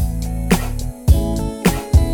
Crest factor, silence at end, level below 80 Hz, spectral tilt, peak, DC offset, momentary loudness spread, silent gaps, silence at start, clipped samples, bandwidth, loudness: 16 dB; 0 s; -20 dBFS; -6 dB/octave; 0 dBFS; under 0.1%; 7 LU; none; 0 s; under 0.1%; over 20 kHz; -19 LUFS